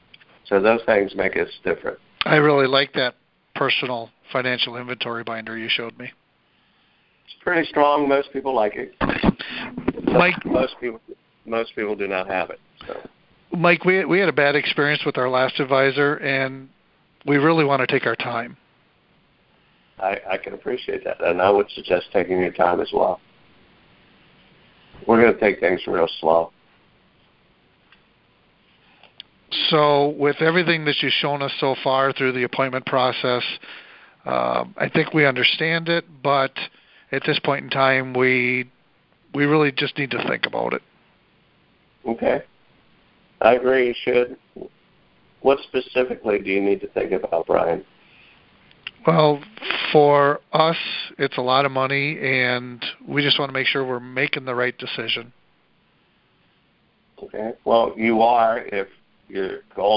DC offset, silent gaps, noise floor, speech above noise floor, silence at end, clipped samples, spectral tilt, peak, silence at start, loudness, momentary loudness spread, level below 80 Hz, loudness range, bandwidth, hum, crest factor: under 0.1%; none; -62 dBFS; 42 dB; 0 s; under 0.1%; -9.5 dB/octave; 0 dBFS; 0.45 s; -20 LUFS; 13 LU; -54 dBFS; 6 LU; 5.6 kHz; none; 22 dB